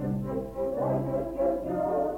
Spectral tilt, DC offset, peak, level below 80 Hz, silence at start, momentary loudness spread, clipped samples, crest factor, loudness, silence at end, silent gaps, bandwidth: -10 dB/octave; under 0.1%; -16 dBFS; -48 dBFS; 0 s; 4 LU; under 0.1%; 12 dB; -30 LUFS; 0 s; none; 17 kHz